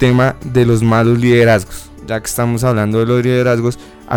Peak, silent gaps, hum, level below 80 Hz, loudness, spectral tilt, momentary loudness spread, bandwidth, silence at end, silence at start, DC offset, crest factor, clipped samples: -2 dBFS; none; none; -36 dBFS; -13 LUFS; -6.5 dB/octave; 11 LU; 17.5 kHz; 0 s; 0 s; under 0.1%; 10 dB; under 0.1%